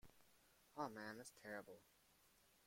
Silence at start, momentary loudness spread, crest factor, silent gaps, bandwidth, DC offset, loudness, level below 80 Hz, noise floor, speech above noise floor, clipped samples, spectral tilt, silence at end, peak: 0.05 s; 13 LU; 24 dB; none; 16.5 kHz; under 0.1%; -54 LUFS; -84 dBFS; -76 dBFS; 20 dB; under 0.1%; -4 dB/octave; 0 s; -34 dBFS